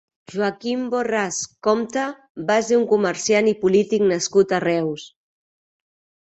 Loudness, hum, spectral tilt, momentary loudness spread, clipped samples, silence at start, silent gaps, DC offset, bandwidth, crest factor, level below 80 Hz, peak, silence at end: -20 LUFS; none; -4 dB/octave; 9 LU; under 0.1%; 0.3 s; 2.30-2.35 s; under 0.1%; 8.2 kHz; 16 dB; -64 dBFS; -4 dBFS; 1.25 s